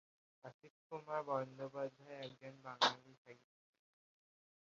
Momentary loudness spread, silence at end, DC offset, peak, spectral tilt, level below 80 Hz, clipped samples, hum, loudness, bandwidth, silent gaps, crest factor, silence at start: 24 LU; 1.35 s; under 0.1%; -20 dBFS; -1 dB/octave; under -90 dBFS; under 0.1%; none; -42 LUFS; 7.4 kHz; 0.54-0.60 s, 0.70-0.90 s, 3.18-3.25 s; 26 dB; 0.45 s